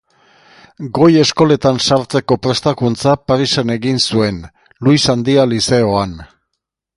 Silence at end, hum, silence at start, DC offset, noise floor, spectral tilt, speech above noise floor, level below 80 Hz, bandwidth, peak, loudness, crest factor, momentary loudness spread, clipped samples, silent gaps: 0.7 s; none; 0.8 s; under 0.1%; -75 dBFS; -5 dB/octave; 62 dB; -44 dBFS; 11.5 kHz; 0 dBFS; -14 LUFS; 14 dB; 8 LU; under 0.1%; none